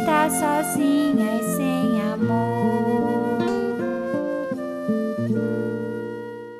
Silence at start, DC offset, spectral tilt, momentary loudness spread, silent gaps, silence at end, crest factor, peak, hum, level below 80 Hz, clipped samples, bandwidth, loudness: 0 s; under 0.1%; -6 dB/octave; 8 LU; none; 0 s; 16 dB; -6 dBFS; none; -66 dBFS; under 0.1%; 15.5 kHz; -23 LUFS